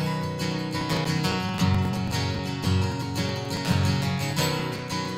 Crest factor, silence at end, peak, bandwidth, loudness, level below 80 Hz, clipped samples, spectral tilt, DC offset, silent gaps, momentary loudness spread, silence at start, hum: 16 dB; 0 s; -10 dBFS; 16 kHz; -26 LUFS; -48 dBFS; under 0.1%; -5.5 dB/octave; under 0.1%; none; 5 LU; 0 s; none